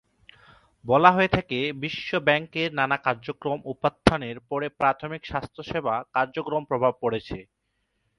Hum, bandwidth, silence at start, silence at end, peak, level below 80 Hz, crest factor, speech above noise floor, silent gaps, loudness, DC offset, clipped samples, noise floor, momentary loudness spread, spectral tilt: none; 11.5 kHz; 0.85 s; 0.75 s; 0 dBFS; -50 dBFS; 24 dB; 50 dB; none; -25 LUFS; under 0.1%; under 0.1%; -75 dBFS; 12 LU; -6 dB/octave